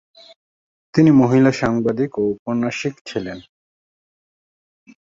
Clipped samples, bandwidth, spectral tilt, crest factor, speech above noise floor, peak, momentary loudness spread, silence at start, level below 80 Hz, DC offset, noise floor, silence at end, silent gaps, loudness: under 0.1%; 7.6 kHz; -7.5 dB/octave; 18 dB; over 73 dB; -2 dBFS; 15 LU; 0.95 s; -52 dBFS; under 0.1%; under -90 dBFS; 1.65 s; 2.39-2.46 s, 3.01-3.05 s; -18 LUFS